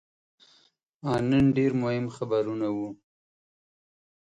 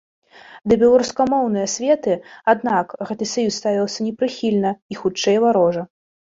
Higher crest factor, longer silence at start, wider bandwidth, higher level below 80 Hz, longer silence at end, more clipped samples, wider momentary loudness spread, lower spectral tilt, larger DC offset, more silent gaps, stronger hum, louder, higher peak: about the same, 16 dB vs 16 dB; first, 1.05 s vs 0.5 s; first, 9 kHz vs 7.8 kHz; about the same, -56 dBFS vs -56 dBFS; first, 1.4 s vs 0.45 s; neither; about the same, 11 LU vs 10 LU; first, -8 dB/octave vs -4.5 dB/octave; neither; second, none vs 4.82-4.89 s; neither; second, -27 LUFS vs -19 LUFS; second, -12 dBFS vs -2 dBFS